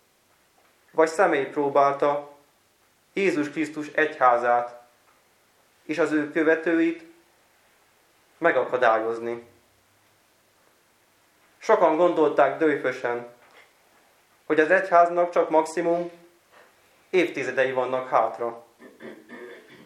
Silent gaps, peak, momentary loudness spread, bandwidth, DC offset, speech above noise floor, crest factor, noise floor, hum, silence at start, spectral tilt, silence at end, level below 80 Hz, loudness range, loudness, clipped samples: none; -4 dBFS; 17 LU; 13 kHz; under 0.1%; 41 dB; 22 dB; -63 dBFS; none; 0.95 s; -5.5 dB/octave; 0.25 s; -82 dBFS; 4 LU; -23 LUFS; under 0.1%